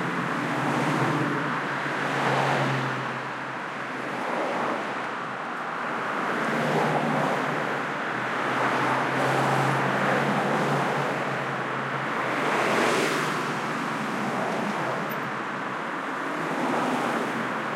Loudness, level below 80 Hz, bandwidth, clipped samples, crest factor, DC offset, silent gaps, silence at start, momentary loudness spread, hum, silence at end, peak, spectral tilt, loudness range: -26 LUFS; -72 dBFS; 16.5 kHz; under 0.1%; 16 dB; under 0.1%; none; 0 s; 7 LU; none; 0 s; -10 dBFS; -5 dB/octave; 4 LU